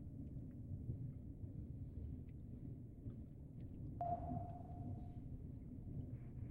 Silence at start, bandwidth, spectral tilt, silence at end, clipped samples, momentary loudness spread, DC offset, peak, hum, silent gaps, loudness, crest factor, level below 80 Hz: 0 s; 3.5 kHz; -11.5 dB/octave; 0 s; under 0.1%; 8 LU; under 0.1%; -30 dBFS; none; none; -51 LUFS; 20 dB; -58 dBFS